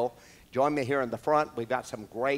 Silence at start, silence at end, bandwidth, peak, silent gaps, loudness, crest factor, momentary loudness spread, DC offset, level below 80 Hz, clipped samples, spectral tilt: 0 s; 0 s; 16 kHz; -12 dBFS; none; -30 LUFS; 18 dB; 8 LU; under 0.1%; -64 dBFS; under 0.1%; -6 dB/octave